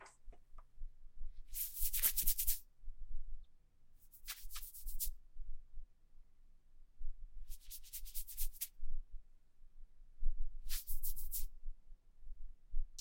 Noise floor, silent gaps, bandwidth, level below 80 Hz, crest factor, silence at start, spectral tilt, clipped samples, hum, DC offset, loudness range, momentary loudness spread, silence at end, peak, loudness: -61 dBFS; none; 17 kHz; -44 dBFS; 22 dB; 0 s; -0.5 dB/octave; under 0.1%; none; under 0.1%; 11 LU; 25 LU; 0 s; -16 dBFS; -42 LUFS